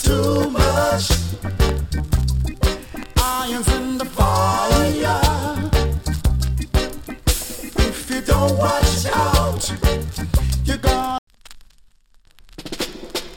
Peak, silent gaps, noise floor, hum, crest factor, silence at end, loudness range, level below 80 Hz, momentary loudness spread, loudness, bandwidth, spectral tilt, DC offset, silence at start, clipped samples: -2 dBFS; 11.18-11.27 s; -51 dBFS; none; 16 dB; 0 s; 3 LU; -24 dBFS; 8 LU; -20 LUFS; 17.5 kHz; -5 dB/octave; under 0.1%; 0 s; under 0.1%